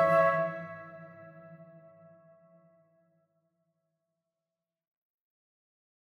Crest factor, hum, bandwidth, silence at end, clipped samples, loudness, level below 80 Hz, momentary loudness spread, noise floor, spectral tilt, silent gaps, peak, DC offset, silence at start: 22 dB; none; 12 kHz; 4.4 s; under 0.1%; -29 LUFS; -82 dBFS; 27 LU; under -90 dBFS; -7 dB/octave; none; -14 dBFS; under 0.1%; 0 s